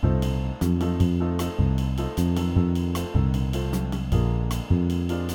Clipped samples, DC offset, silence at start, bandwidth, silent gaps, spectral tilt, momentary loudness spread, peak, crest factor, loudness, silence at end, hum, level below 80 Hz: under 0.1%; under 0.1%; 0 s; 18 kHz; none; -7.5 dB/octave; 4 LU; -8 dBFS; 16 dB; -25 LUFS; 0 s; none; -30 dBFS